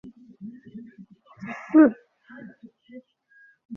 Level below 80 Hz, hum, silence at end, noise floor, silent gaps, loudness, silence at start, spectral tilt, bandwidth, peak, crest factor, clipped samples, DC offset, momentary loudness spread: -72 dBFS; none; 0 s; -58 dBFS; 3.65-3.69 s; -19 LUFS; 0.45 s; -7 dB/octave; 3.1 kHz; -6 dBFS; 22 dB; under 0.1%; under 0.1%; 28 LU